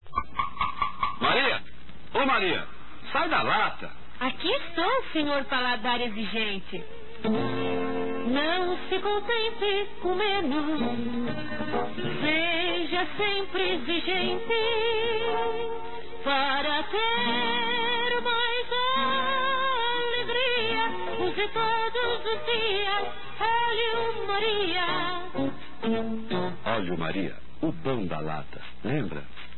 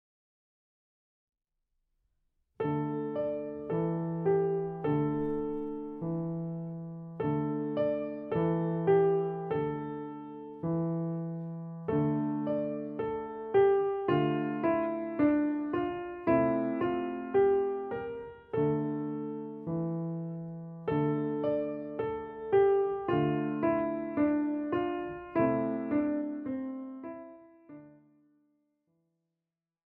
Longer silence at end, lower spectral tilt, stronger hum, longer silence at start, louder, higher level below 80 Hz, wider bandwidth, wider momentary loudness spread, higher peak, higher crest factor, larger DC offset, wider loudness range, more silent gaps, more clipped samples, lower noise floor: second, 0 s vs 2.05 s; second, -8.5 dB/octave vs -11.5 dB/octave; neither; second, 0 s vs 2.6 s; first, -27 LUFS vs -32 LUFS; first, -54 dBFS vs -62 dBFS; first, 4.3 kHz vs 3.9 kHz; second, 8 LU vs 12 LU; about the same, -12 dBFS vs -14 dBFS; about the same, 16 dB vs 18 dB; first, 3% vs under 0.1%; second, 3 LU vs 6 LU; neither; neither; second, -48 dBFS vs -90 dBFS